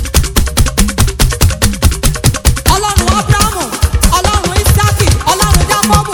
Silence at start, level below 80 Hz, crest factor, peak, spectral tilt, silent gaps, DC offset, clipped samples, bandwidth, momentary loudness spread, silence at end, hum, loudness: 0 s; -14 dBFS; 10 dB; 0 dBFS; -4 dB/octave; none; under 0.1%; 1%; over 20 kHz; 3 LU; 0 s; none; -11 LUFS